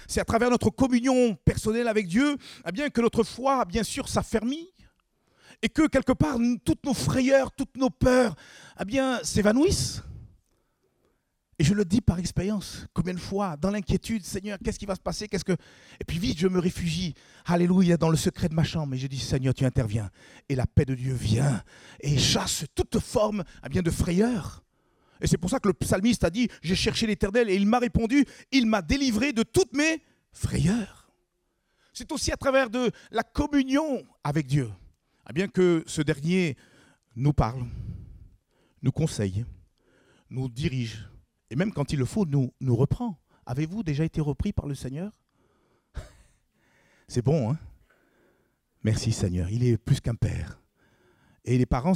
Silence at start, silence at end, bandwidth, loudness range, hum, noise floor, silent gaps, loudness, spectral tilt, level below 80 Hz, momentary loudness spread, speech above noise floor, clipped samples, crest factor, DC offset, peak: 0 s; 0 s; 16 kHz; 7 LU; none; -75 dBFS; none; -26 LUFS; -5.5 dB/octave; -44 dBFS; 12 LU; 49 dB; under 0.1%; 20 dB; under 0.1%; -8 dBFS